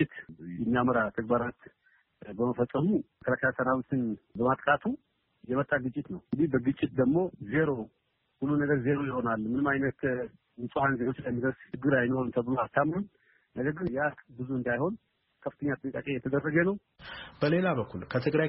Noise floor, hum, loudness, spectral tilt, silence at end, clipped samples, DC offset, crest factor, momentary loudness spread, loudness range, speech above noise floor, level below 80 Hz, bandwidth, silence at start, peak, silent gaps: -58 dBFS; none; -30 LUFS; -6.5 dB/octave; 0 s; under 0.1%; under 0.1%; 18 dB; 12 LU; 3 LU; 29 dB; -60 dBFS; 4.8 kHz; 0 s; -12 dBFS; none